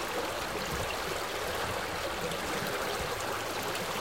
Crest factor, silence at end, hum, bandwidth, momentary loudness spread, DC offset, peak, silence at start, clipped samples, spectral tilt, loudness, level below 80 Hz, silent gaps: 16 dB; 0 s; none; 17 kHz; 1 LU; 0.2%; -20 dBFS; 0 s; under 0.1%; -3 dB/octave; -33 LUFS; -52 dBFS; none